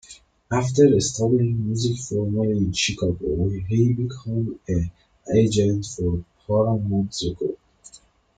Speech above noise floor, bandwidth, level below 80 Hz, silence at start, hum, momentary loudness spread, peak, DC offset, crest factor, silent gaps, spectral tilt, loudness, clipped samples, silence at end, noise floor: 31 dB; 9.4 kHz; -44 dBFS; 0.1 s; none; 9 LU; -4 dBFS; under 0.1%; 18 dB; none; -6 dB/octave; -22 LUFS; under 0.1%; 0.4 s; -52 dBFS